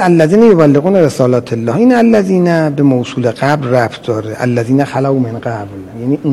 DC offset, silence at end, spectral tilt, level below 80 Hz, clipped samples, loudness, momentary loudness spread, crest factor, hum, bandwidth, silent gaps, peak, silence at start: under 0.1%; 0 s; -7.5 dB/octave; -50 dBFS; 1%; -11 LUFS; 11 LU; 10 dB; none; 13 kHz; none; 0 dBFS; 0 s